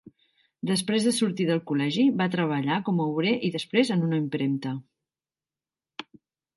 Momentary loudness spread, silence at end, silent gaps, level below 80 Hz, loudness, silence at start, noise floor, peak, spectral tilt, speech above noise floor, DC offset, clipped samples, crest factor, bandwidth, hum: 13 LU; 0.55 s; none; -74 dBFS; -26 LUFS; 0.65 s; under -90 dBFS; -10 dBFS; -5.5 dB/octave; over 65 dB; under 0.1%; under 0.1%; 18 dB; 11.5 kHz; none